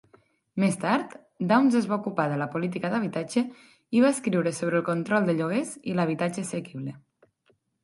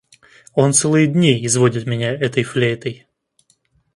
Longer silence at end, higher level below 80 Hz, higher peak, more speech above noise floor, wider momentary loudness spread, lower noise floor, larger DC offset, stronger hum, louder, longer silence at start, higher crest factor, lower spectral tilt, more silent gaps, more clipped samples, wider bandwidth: second, 0.85 s vs 1 s; second, -72 dBFS vs -58 dBFS; second, -8 dBFS vs 0 dBFS; about the same, 43 dB vs 45 dB; about the same, 11 LU vs 9 LU; first, -69 dBFS vs -61 dBFS; neither; neither; second, -26 LUFS vs -17 LUFS; about the same, 0.55 s vs 0.55 s; about the same, 20 dB vs 18 dB; first, -6 dB/octave vs -4.5 dB/octave; neither; neither; about the same, 11.5 kHz vs 11.5 kHz